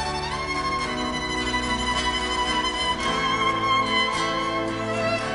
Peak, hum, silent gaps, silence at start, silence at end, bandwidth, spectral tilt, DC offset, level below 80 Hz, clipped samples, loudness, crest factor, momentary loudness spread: -10 dBFS; none; none; 0 s; 0 s; 11 kHz; -3 dB/octave; under 0.1%; -40 dBFS; under 0.1%; -24 LUFS; 14 dB; 5 LU